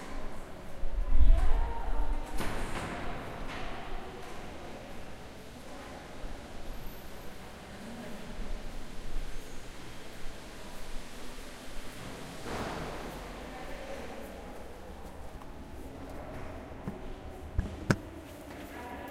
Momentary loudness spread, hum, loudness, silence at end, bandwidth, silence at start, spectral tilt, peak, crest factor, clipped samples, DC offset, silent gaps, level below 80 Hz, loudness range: 12 LU; none; -40 LUFS; 0 s; 13 kHz; 0 s; -5.5 dB/octave; -6 dBFS; 26 dB; under 0.1%; under 0.1%; none; -34 dBFS; 10 LU